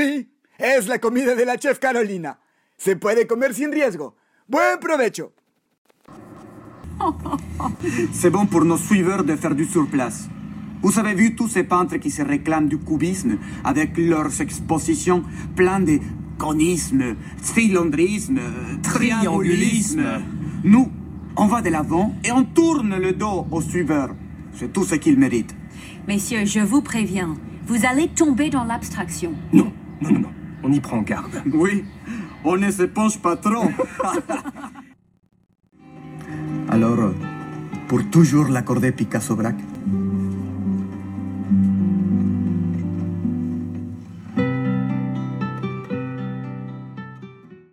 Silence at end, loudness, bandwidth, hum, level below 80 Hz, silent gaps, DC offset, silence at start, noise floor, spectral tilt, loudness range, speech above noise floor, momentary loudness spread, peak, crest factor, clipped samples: 0.15 s; -21 LUFS; 16 kHz; none; -46 dBFS; 5.78-5.85 s; under 0.1%; 0 s; -43 dBFS; -6 dB/octave; 6 LU; 24 dB; 14 LU; 0 dBFS; 20 dB; under 0.1%